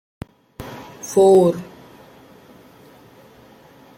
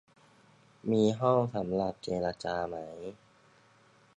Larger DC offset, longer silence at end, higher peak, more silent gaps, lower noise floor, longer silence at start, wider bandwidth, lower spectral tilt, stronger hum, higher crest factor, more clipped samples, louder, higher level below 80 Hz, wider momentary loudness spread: neither; first, 2.35 s vs 1 s; first, -4 dBFS vs -14 dBFS; neither; second, -47 dBFS vs -63 dBFS; second, 0.6 s vs 0.85 s; first, 16 kHz vs 9.8 kHz; about the same, -6.5 dB/octave vs -7 dB/octave; neither; about the same, 18 dB vs 20 dB; neither; first, -16 LUFS vs -31 LUFS; first, -54 dBFS vs -62 dBFS; first, 27 LU vs 15 LU